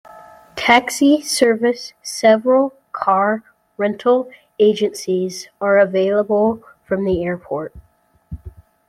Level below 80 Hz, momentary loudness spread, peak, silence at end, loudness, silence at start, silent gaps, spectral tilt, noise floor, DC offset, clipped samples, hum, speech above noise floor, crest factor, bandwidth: -50 dBFS; 14 LU; 0 dBFS; 0.4 s; -17 LUFS; 0.05 s; none; -4.5 dB/octave; -42 dBFS; under 0.1%; under 0.1%; none; 26 dB; 18 dB; 15.5 kHz